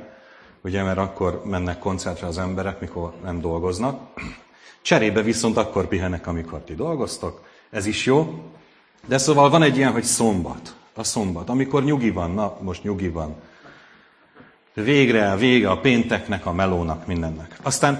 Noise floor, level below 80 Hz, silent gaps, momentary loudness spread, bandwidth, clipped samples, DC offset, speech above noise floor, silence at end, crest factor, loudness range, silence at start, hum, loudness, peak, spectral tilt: -53 dBFS; -44 dBFS; none; 14 LU; 11 kHz; under 0.1%; under 0.1%; 32 dB; 0 s; 22 dB; 7 LU; 0 s; none; -22 LUFS; -2 dBFS; -5 dB/octave